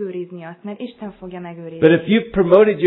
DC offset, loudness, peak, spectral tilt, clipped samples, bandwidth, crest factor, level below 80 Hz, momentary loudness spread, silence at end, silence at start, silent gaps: under 0.1%; -15 LUFS; 0 dBFS; -10.5 dB/octave; under 0.1%; 4.2 kHz; 18 dB; -48 dBFS; 20 LU; 0 s; 0 s; none